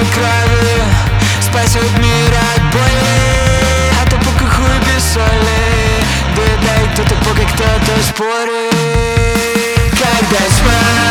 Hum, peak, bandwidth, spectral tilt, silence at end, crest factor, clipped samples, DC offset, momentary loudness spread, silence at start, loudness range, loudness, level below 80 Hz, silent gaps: none; 0 dBFS; 19.5 kHz; -4.5 dB/octave; 0 s; 10 dB; under 0.1%; under 0.1%; 2 LU; 0 s; 2 LU; -11 LUFS; -18 dBFS; none